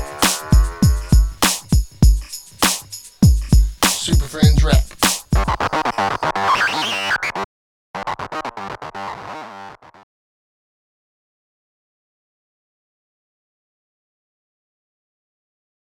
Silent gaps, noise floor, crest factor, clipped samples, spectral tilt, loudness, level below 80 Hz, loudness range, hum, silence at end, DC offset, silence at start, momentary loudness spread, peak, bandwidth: 7.44-7.94 s; -38 dBFS; 20 dB; under 0.1%; -4 dB/octave; -18 LUFS; -22 dBFS; 16 LU; none; 6.25 s; under 0.1%; 0 s; 15 LU; 0 dBFS; over 20 kHz